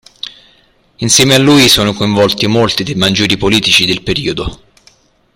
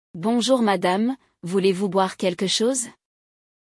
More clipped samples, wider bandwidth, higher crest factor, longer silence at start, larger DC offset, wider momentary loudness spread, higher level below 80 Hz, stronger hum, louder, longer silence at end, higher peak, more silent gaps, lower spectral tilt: first, 0.1% vs under 0.1%; first, over 20 kHz vs 12 kHz; about the same, 12 dB vs 16 dB; about the same, 0.25 s vs 0.15 s; neither; first, 15 LU vs 7 LU; first, -36 dBFS vs -70 dBFS; neither; first, -9 LUFS vs -22 LUFS; about the same, 0.8 s vs 0.85 s; first, 0 dBFS vs -8 dBFS; neither; about the same, -3.5 dB/octave vs -4 dB/octave